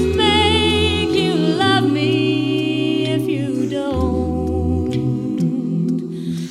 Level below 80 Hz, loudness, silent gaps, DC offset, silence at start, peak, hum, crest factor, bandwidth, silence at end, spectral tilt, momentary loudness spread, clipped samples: -34 dBFS; -18 LUFS; none; under 0.1%; 0 s; -2 dBFS; none; 16 dB; 14 kHz; 0 s; -6 dB/octave; 6 LU; under 0.1%